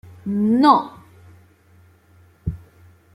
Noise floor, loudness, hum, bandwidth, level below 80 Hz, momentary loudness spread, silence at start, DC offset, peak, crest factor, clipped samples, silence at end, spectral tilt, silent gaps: -53 dBFS; -19 LUFS; none; 12.5 kHz; -46 dBFS; 21 LU; 0.25 s; under 0.1%; -2 dBFS; 20 dB; under 0.1%; 0.55 s; -7.5 dB/octave; none